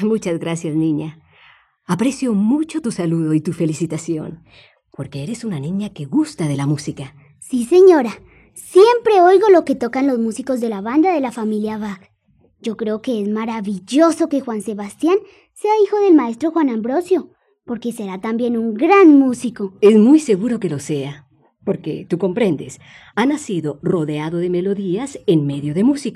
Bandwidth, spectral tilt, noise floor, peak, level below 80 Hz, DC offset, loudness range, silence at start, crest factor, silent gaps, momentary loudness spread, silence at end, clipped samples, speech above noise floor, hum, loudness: 12.5 kHz; -6.5 dB/octave; -58 dBFS; 0 dBFS; -60 dBFS; under 0.1%; 8 LU; 0 s; 16 dB; none; 15 LU; 0 s; under 0.1%; 41 dB; none; -17 LUFS